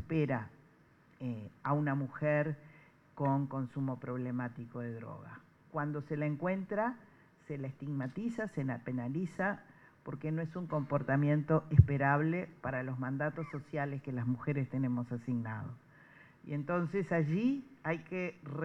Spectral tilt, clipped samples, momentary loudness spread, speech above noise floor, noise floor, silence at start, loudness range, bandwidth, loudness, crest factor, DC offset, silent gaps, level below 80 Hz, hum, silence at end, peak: -9.5 dB/octave; under 0.1%; 13 LU; 30 dB; -65 dBFS; 0 s; 7 LU; 7.8 kHz; -36 LUFS; 26 dB; under 0.1%; none; -58 dBFS; none; 0 s; -8 dBFS